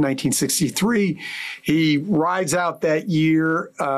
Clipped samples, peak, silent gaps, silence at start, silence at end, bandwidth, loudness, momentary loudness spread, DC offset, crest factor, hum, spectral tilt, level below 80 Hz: under 0.1%; -10 dBFS; none; 0 s; 0 s; 15 kHz; -20 LUFS; 5 LU; under 0.1%; 10 dB; none; -4.5 dB/octave; -58 dBFS